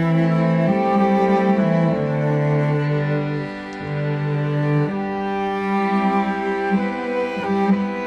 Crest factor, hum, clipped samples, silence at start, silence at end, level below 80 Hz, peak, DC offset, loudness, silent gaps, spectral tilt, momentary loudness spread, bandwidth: 14 dB; none; under 0.1%; 0 s; 0 s; -52 dBFS; -6 dBFS; under 0.1%; -20 LUFS; none; -9 dB/octave; 7 LU; 7.6 kHz